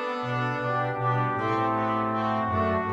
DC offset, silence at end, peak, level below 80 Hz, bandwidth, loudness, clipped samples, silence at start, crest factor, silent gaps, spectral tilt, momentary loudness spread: under 0.1%; 0 s; -14 dBFS; -58 dBFS; 8 kHz; -26 LUFS; under 0.1%; 0 s; 14 dB; none; -8 dB/octave; 2 LU